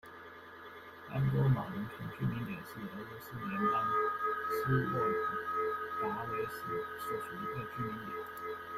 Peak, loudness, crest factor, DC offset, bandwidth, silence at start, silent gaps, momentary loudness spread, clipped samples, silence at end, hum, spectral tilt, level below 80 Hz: -20 dBFS; -36 LUFS; 16 dB; under 0.1%; 16 kHz; 0.05 s; none; 14 LU; under 0.1%; 0 s; none; -7.5 dB/octave; -62 dBFS